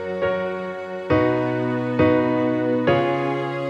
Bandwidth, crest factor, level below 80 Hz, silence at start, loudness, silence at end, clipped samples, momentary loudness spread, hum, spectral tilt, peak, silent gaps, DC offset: 7.4 kHz; 16 dB; -50 dBFS; 0 s; -21 LUFS; 0 s; under 0.1%; 8 LU; none; -8.5 dB/octave; -6 dBFS; none; under 0.1%